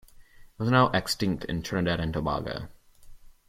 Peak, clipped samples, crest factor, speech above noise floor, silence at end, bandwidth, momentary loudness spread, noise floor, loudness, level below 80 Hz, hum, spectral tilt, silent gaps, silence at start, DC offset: -8 dBFS; under 0.1%; 20 dB; 24 dB; 0.2 s; 16.5 kHz; 13 LU; -51 dBFS; -27 LUFS; -48 dBFS; none; -5.5 dB/octave; none; 0.2 s; under 0.1%